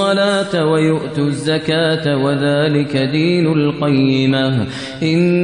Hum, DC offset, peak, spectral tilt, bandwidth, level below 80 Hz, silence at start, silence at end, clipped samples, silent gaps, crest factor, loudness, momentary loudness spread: none; 0.2%; -2 dBFS; -6.5 dB/octave; 10.5 kHz; -54 dBFS; 0 s; 0 s; under 0.1%; none; 12 dB; -15 LUFS; 4 LU